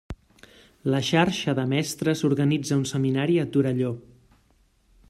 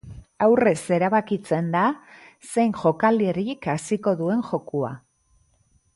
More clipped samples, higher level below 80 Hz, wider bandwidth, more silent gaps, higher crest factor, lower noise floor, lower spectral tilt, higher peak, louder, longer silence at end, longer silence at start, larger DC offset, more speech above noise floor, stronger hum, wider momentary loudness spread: neither; about the same, -54 dBFS vs -58 dBFS; first, 13 kHz vs 11.5 kHz; neither; about the same, 20 dB vs 18 dB; about the same, -63 dBFS vs -63 dBFS; about the same, -6 dB/octave vs -6.5 dB/octave; about the same, -6 dBFS vs -6 dBFS; about the same, -24 LUFS vs -23 LUFS; about the same, 1.1 s vs 1 s; about the same, 0.1 s vs 0.05 s; neither; about the same, 39 dB vs 42 dB; neither; about the same, 9 LU vs 9 LU